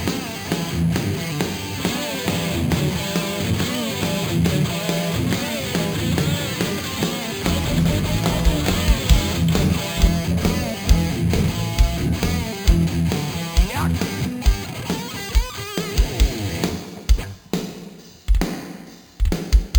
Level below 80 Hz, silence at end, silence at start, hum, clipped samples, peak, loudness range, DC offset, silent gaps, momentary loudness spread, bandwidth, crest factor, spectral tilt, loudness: -24 dBFS; 0 s; 0 s; none; under 0.1%; -2 dBFS; 5 LU; under 0.1%; none; 7 LU; over 20 kHz; 20 dB; -5 dB/octave; -22 LUFS